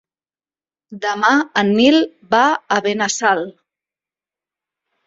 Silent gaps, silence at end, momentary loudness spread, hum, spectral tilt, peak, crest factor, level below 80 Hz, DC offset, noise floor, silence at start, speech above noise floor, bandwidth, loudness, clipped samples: none; 1.55 s; 9 LU; none; -3.5 dB/octave; -2 dBFS; 18 dB; -62 dBFS; under 0.1%; under -90 dBFS; 0.9 s; over 74 dB; 7.8 kHz; -16 LUFS; under 0.1%